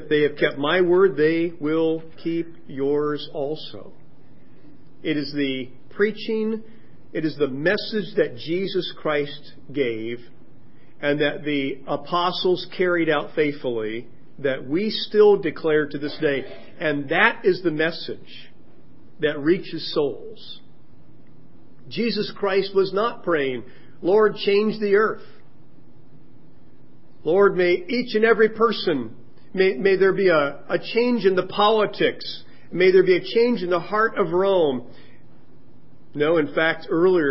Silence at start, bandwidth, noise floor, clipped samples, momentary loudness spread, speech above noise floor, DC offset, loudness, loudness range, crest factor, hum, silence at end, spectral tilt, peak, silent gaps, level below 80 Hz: 0 s; 5.8 kHz; -52 dBFS; under 0.1%; 15 LU; 31 dB; 2%; -22 LUFS; 8 LU; 22 dB; none; 0 s; -10 dB/octave; 0 dBFS; none; -66 dBFS